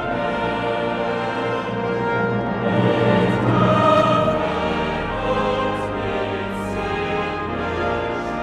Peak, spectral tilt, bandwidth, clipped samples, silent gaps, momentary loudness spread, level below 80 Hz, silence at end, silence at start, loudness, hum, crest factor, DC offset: -4 dBFS; -7 dB/octave; 11.5 kHz; under 0.1%; none; 8 LU; -40 dBFS; 0 s; 0 s; -21 LUFS; none; 16 dB; under 0.1%